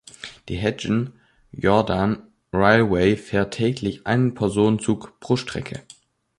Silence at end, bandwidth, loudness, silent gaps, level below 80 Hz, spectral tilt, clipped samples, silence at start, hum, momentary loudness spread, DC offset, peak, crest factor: 0.6 s; 11.5 kHz; -22 LUFS; none; -46 dBFS; -6.5 dB/octave; under 0.1%; 0.25 s; none; 14 LU; under 0.1%; -2 dBFS; 20 dB